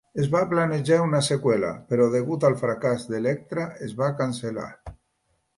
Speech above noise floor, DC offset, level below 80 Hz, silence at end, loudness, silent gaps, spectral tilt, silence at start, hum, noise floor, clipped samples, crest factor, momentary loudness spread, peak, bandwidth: 48 dB; under 0.1%; -56 dBFS; 0.65 s; -24 LUFS; none; -6 dB/octave; 0.15 s; none; -72 dBFS; under 0.1%; 16 dB; 10 LU; -8 dBFS; 11.5 kHz